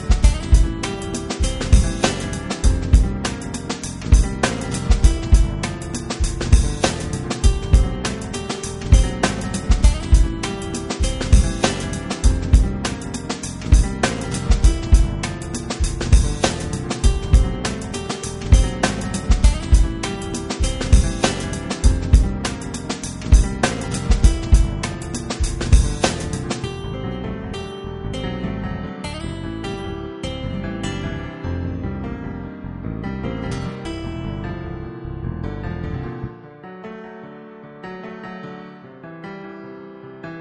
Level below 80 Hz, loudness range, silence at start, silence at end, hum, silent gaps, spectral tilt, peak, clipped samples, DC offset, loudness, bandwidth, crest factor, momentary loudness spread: -20 dBFS; 10 LU; 0 s; 0 s; none; none; -5 dB/octave; 0 dBFS; under 0.1%; under 0.1%; -21 LUFS; 11.5 kHz; 18 dB; 15 LU